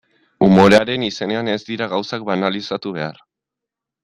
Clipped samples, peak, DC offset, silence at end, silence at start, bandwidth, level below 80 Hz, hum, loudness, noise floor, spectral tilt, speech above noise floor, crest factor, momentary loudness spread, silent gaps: under 0.1%; -2 dBFS; under 0.1%; 0.9 s; 0.4 s; 11 kHz; -54 dBFS; none; -17 LUFS; -84 dBFS; -6 dB/octave; 65 dB; 18 dB; 14 LU; none